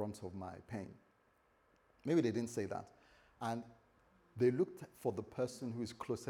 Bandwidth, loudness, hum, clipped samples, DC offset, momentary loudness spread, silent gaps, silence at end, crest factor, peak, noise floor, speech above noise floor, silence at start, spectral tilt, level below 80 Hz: 15.5 kHz; -40 LUFS; none; under 0.1%; under 0.1%; 14 LU; none; 0 s; 20 dB; -22 dBFS; -74 dBFS; 34 dB; 0 s; -6.5 dB/octave; -76 dBFS